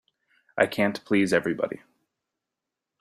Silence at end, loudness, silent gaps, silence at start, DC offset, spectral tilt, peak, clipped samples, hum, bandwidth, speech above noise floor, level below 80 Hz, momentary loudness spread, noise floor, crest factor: 1.25 s; -25 LUFS; none; 0.55 s; under 0.1%; -5.5 dB/octave; -4 dBFS; under 0.1%; none; 14 kHz; 62 dB; -66 dBFS; 13 LU; -86 dBFS; 24 dB